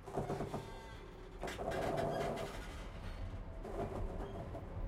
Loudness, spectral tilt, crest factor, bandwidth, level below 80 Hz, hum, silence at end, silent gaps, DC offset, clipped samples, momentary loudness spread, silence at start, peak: -44 LUFS; -6 dB/octave; 18 dB; 16 kHz; -50 dBFS; none; 0 s; none; under 0.1%; under 0.1%; 12 LU; 0 s; -26 dBFS